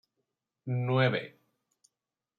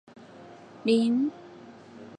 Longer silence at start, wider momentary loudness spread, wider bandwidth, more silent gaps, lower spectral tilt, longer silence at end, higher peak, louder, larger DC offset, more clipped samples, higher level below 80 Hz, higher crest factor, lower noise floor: first, 0.65 s vs 0.4 s; second, 19 LU vs 25 LU; second, 4.5 kHz vs 9.8 kHz; neither; first, -8 dB/octave vs -6 dB/octave; first, 1.1 s vs 0.05 s; about the same, -12 dBFS vs -12 dBFS; second, -30 LUFS vs -26 LUFS; neither; neither; about the same, -76 dBFS vs -78 dBFS; about the same, 20 dB vs 18 dB; first, -89 dBFS vs -48 dBFS